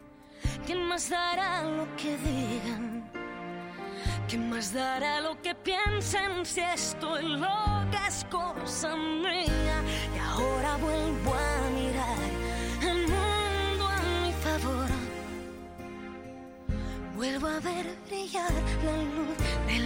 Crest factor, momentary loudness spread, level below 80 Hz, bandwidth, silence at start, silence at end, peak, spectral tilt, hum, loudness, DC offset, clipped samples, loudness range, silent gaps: 14 dB; 10 LU; -38 dBFS; 16.5 kHz; 0 s; 0 s; -16 dBFS; -4 dB/octave; none; -31 LUFS; under 0.1%; under 0.1%; 5 LU; none